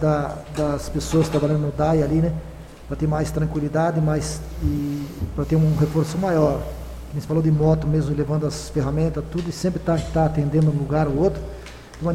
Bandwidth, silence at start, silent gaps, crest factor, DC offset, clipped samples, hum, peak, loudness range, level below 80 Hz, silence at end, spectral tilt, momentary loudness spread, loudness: 14 kHz; 0 s; none; 14 dB; under 0.1%; under 0.1%; none; -6 dBFS; 2 LU; -34 dBFS; 0 s; -7.5 dB/octave; 11 LU; -22 LUFS